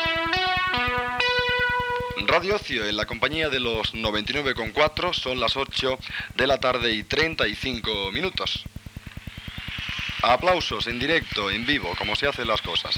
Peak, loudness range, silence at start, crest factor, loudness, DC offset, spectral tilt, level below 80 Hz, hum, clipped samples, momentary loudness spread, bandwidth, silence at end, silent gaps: -6 dBFS; 3 LU; 0 s; 20 dB; -24 LUFS; under 0.1%; -4 dB/octave; -44 dBFS; none; under 0.1%; 8 LU; 18.5 kHz; 0 s; none